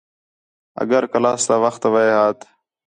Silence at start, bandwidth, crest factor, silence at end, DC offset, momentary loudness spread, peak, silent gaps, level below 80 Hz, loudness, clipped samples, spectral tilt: 0.8 s; 10 kHz; 16 dB; 0.55 s; under 0.1%; 12 LU; -4 dBFS; none; -68 dBFS; -17 LUFS; under 0.1%; -4 dB/octave